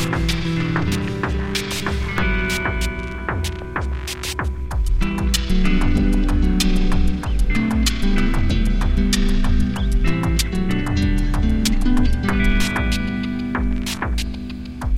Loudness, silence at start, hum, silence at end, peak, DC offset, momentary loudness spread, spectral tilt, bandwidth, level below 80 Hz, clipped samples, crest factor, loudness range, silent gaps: -21 LUFS; 0 s; none; 0 s; -4 dBFS; under 0.1%; 6 LU; -5 dB/octave; 16 kHz; -20 dBFS; under 0.1%; 14 dB; 3 LU; none